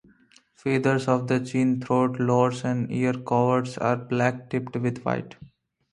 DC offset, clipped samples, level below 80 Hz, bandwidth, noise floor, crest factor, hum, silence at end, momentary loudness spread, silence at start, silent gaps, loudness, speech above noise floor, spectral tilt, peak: under 0.1%; under 0.1%; -62 dBFS; 11 kHz; -58 dBFS; 18 dB; none; 0.45 s; 7 LU; 0.65 s; none; -25 LUFS; 34 dB; -7.5 dB/octave; -6 dBFS